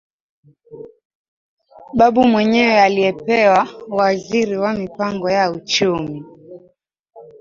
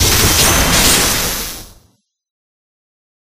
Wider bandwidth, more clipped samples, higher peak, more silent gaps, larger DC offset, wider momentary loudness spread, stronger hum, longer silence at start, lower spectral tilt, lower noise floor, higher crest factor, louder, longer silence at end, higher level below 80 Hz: second, 7.4 kHz vs 16 kHz; neither; about the same, 0 dBFS vs 0 dBFS; first, 1.05-1.58 s, 7.00-7.04 s vs none; neither; second, 10 LU vs 14 LU; neither; first, 0.7 s vs 0 s; first, -5 dB/octave vs -2 dB/octave; about the same, -54 dBFS vs -57 dBFS; about the same, 18 dB vs 16 dB; second, -16 LUFS vs -10 LUFS; second, 0.2 s vs 1.6 s; second, -52 dBFS vs -26 dBFS